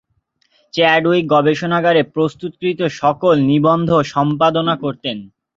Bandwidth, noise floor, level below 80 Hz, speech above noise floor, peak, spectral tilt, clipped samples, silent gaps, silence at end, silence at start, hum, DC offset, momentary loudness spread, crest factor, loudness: 7.6 kHz; -64 dBFS; -54 dBFS; 49 dB; -2 dBFS; -6.5 dB/octave; under 0.1%; none; 0.3 s; 0.75 s; none; under 0.1%; 9 LU; 14 dB; -16 LUFS